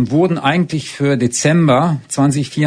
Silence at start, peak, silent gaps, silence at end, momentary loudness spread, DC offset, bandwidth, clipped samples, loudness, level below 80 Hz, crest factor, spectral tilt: 0 s; 0 dBFS; none; 0 s; 6 LU; under 0.1%; 10 kHz; under 0.1%; -15 LUFS; -52 dBFS; 14 dB; -5.5 dB/octave